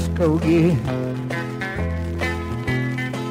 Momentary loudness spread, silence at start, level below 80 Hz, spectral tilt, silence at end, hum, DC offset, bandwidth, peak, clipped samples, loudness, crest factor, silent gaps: 9 LU; 0 s; -36 dBFS; -7 dB/octave; 0 s; none; under 0.1%; 15.5 kHz; -6 dBFS; under 0.1%; -22 LUFS; 14 dB; none